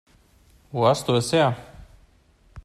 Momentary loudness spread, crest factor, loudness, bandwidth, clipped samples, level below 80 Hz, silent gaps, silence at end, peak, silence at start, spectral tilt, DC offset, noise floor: 13 LU; 18 dB; -22 LUFS; 13.5 kHz; under 0.1%; -54 dBFS; none; 0.05 s; -6 dBFS; 0.75 s; -5.5 dB/octave; under 0.1%; -58 dBFS